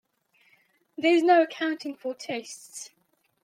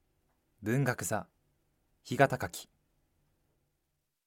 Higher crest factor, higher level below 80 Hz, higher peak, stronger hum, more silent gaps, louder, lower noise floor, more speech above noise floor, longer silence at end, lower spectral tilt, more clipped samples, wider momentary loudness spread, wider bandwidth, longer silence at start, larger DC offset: second, 18 dB vs 28 dB; second, -84 dBFS vs -68 dBFS; about the same, -8 dBFS vs -8 dBFS; neither; neither; first, -25 LUFS vs -32 LUFS; second, -66 dBFS vs -82 dBFS; second, 41 dB vs 51 dB; second, 0.55 s vs 1.65 s; second, -3 dB/octave vs -5.5 dB/octave; neither; first, 21 LU vs 12 LU; second, 14 kHz vs 17 kHz; first, 1 s vs 0.6 s; neither